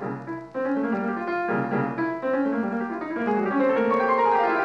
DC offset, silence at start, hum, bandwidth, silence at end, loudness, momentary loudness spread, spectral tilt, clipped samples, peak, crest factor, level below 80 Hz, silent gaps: under 0.1%; 0 s; none; 7.4 kHz; 0 s; -25 LUFS; 9 LU; -8 dB/octave; under 0.1%; -10 dBFS; 14 dB; -68 dBFS; none